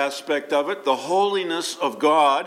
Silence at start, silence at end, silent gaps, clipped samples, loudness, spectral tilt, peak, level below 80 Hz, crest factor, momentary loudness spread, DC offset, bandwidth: 0 s; 0 s; none; under 0.1%; -22 LUFS; -3 dB/octave; -6 dBFS; -84 dBFS; 16 dB; 8 LU; under 0.1%; 16 kHz